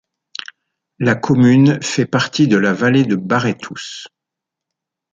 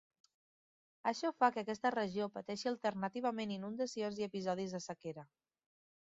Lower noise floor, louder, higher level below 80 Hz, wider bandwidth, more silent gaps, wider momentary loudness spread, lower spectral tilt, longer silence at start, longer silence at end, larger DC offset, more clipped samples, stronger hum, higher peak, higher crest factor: second, -83 dBFS vs under -90 dBFS; first, -15 LUFS vs -39 LUFS; first, -56 dBFS vs -82 dBFS; about the same, 7.8 kHz vs 7.6 kHz; neither; first, 19 LU vs 10 LU; first, -6 dB/octave vs -4 dB/octave; about the same, 1 s vs 1.05 s; first, 1.05 s vs 0.9 s; neither; neither; neither; first, -2 dBFS vs -18 dBFS; second, 16 dB vs 22 dB